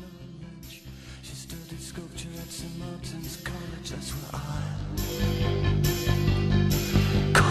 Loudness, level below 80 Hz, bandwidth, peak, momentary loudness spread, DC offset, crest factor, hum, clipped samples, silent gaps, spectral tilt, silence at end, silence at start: -28 LUFS; -38 dBFS; 15 kHz; -6 dBFS; 19 LU; under 0.1%; 22 dB; none; under 0.1%; none; -5.5 dB/octave; 0 s; 0 s